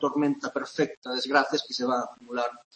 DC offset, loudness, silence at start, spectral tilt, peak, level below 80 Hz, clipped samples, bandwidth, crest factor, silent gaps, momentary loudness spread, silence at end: under 0.1%; -28 LUFS; 0 s; -4 dB/octave; -6 dBFS; -76 dBFS; under 0.1%; 8.8 kHz; 22 dB; 0.97-1.02 s; 7 LU; 0.15 s